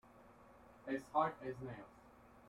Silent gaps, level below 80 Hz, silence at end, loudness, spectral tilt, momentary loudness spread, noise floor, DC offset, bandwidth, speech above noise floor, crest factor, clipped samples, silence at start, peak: none; -72 dBFS; 0 s; -42 LUFS; -7 dB/octave; 26 LU; -63 dBFS; under 0.1%; 15.5 kHz; 22 dB; 24 dB; under 0.1%; 0.05 s; -20 dBFS